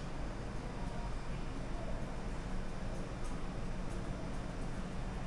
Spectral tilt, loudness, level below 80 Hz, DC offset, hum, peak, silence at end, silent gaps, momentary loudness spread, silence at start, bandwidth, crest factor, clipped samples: -6 dB/octave; -44 LUFS; -42 dBFS; 0.2%; none; -26 dBFS; 0 s; none; 1 LU; 0 s; 11.5 kHz; 12 dB; under 0.1%